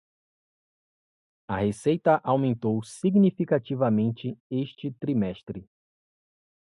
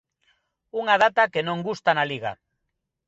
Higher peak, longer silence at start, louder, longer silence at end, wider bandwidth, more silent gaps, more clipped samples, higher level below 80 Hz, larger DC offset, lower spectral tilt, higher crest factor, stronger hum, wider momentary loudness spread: second, -8 dBFS vs -4 dBFS; first, 1.5 s vs 0.75 s; second, -26 LUFS vs -23 LUFS; first, 1.05 s vs 0.75 s; first, 11.5 kHz vs 7.8 kHz; first, 4.40-4.50 s vs none; neither; first, -60 dBFS vs -68 dBFS; neither; first, -8 dB/octave vs -5 dB/octave; about the same, 20 dB vs 20 dB; neither; about the same, 12 LU vs 13 LU